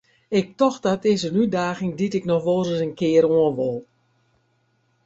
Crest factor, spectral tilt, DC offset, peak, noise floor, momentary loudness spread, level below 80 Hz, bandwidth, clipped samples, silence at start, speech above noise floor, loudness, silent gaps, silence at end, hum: 18 dB; -6.5 dB/octave; under 0.1%; -6 dBFS; -66 dBFS; 7 LU; -60 dBFS; 8 kHz; under 0.1%; 0.3 s; 46 dB; -21 LUFS; none; 1.25 s; none